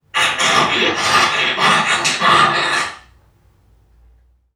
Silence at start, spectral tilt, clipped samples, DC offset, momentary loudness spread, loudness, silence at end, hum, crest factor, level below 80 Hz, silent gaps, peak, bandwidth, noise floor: 0.15 s; -1.5 dB/octave; under 0.1%; under 0.1%; 5 LU; -14 LUFS; 1.55 s; none; 16 dB; -52 dBFS; none; 0 dBFS; 17 kHz; -53 dBFS